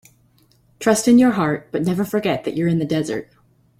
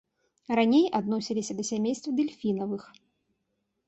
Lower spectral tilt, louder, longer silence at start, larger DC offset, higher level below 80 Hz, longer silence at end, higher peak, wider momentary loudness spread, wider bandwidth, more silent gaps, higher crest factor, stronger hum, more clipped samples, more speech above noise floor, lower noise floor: about the same, -5.5 dB/octave vs -5 dB/octave; first, -19 LUFS vs -28 LUFS; first, 0.8 s vs 0.5 s; neither; first, -56 dBFS vs -70 dBFS; second, 0.55 s vs 1.05 s; first, -2 dBFS vs -12 dBFS; about the same, 9 LU vs 9 LU; first, 16 kHz vs 8.2 kHz; neither; about the same, 18 dB vs 18 dB; neither; neither; second, 39 dB vs 52 dB; second, -57 dBFS vs -79 dBFS